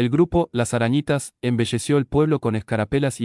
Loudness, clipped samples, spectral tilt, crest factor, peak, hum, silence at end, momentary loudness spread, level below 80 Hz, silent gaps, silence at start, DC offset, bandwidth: -21 LUFS; under 0.1%; -6 dB/octave; 14 dB; -6 dBFS; none; 0 s; 5 LU; -44 dBFS; none; 0 s; under 0.1%; 12 kHz